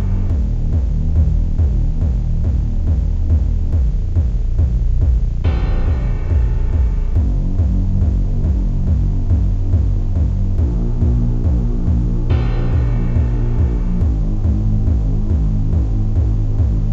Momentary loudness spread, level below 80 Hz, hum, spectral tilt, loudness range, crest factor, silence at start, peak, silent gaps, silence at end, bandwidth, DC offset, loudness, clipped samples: 2 LU; -16 dBFS; none; -10 dB/octave; 0 LU; 10 dB; 0 s; -4 dBFS; none; 0 s; 4.3 kHz; under 0.1%; -18 LUFS; under 0.1%